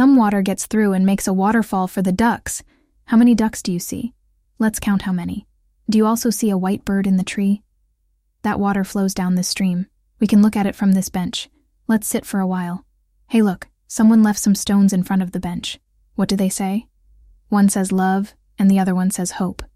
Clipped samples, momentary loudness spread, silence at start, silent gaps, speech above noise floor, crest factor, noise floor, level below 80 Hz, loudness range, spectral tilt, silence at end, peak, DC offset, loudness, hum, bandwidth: under 0.1%; 13 LU; 0 s; none; 48 dB; 14 dB; -65 dBFS; -48 dBFS; 3 LU; -5.5 dB/octave; 0.1 s; -6 dBFS; under 0.1%; -18 LUFS; none; 15.5 kHz